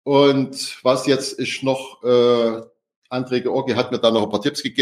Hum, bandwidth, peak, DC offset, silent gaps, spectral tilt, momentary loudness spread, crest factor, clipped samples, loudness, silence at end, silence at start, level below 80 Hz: none; 15 kHz; -2 dBFS; under 0.1%; 2.96-3.02 s; -5 dB/octave; 9 LU; 18 dB; under 0.1%; -19 LUFS; 0 s; 0.05 s; -68 dBFS